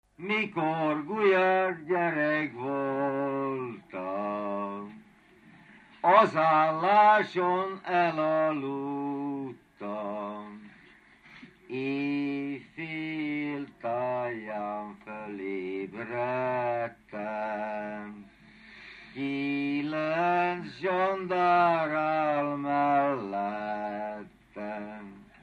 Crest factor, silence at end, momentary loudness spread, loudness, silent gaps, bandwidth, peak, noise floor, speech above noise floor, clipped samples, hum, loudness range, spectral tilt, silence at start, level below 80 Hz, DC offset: 22 dB; 0.2 s; 16 LU; -29 LUFS; none; 9 kHz; -6 dBFS; -57 dBFS; 29 dB; under 0.1%; none; 10 LU; -7 dB/octave; 0.2 s; -72 dBFS; under 0.1%